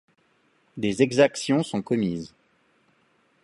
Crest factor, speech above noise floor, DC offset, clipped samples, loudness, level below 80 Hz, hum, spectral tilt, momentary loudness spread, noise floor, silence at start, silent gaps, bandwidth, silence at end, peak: 22 dB; 42 dB; under 0.1%; under 0.1%; -24 LUFS; -62 dBFS; none; -5.5 dB/octave; 17 LU; -65 dBFS; 0.75 s; none; 11.5 kHz; 1.15 s; -4 dBFS